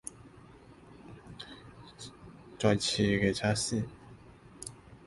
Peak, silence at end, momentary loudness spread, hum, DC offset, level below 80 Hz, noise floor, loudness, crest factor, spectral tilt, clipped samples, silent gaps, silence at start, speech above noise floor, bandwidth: -12 dBFS; 0.1 s; 24 LU; none; under 0.1%; -56 dBFS; -54 dBFS; -30 LUFS; 22 dB; -4.5 dB/octave; under 0.1%; none; 0.05 s; 25 dB; 11.5 kHz